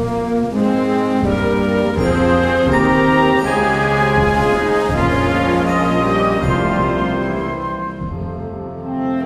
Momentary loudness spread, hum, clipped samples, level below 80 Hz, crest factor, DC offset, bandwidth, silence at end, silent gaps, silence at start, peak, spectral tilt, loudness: 11 LU; none; under 0.1%; -32 dBFS; 14 dB; under 0.1%; 13.5 kHz; 0 s; none; 0 s; -2 dBFS; -7 dB/octave; -16 LUFS